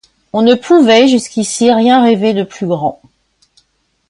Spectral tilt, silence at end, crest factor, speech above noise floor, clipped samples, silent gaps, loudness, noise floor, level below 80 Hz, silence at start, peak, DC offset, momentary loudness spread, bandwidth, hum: -4.5 dB/octave; 1.15 s; 12 dB; 50 dB; under 0.1%; none; -11 LUFS; -60 dBFS; -56 dBFS; 0.35 s; 0 dBFS; under 0.1%; 10 LU; 11 kHz; none